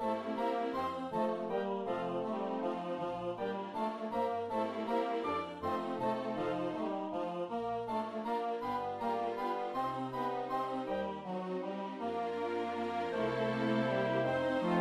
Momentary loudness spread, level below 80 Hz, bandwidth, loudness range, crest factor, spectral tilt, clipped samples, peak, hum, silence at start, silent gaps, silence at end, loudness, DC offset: 5 LU; -70 dBFS; 13.5 kHz; 2 LU; 16 dB; -7 dB/octave; under 0.1%; -20 dBFS; none; 0 s; none; 0 s; -36 LUFS; under 0.1%